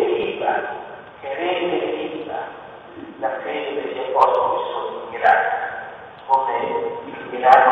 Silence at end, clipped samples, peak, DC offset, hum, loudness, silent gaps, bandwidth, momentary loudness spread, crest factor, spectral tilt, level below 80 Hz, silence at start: 0 s; under 0.1%; 0 dBFS; under 0.1%; none; -21 LUFS; none; 8 kHz; 18 LU; 20 dB; -5.5 dB/octave; -62 dBFS; 0 s